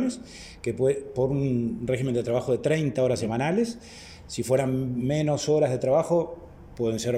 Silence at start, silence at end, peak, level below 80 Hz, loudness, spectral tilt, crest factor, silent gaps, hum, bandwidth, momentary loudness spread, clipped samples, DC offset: 0 s; 0 s; -10 dBFS; -54 dBFS; -26 LUFS; -6.5 dB/octave; 14 dB; none; none; 15.5 kHz; 14 LU; under 0.1%; under 0.1%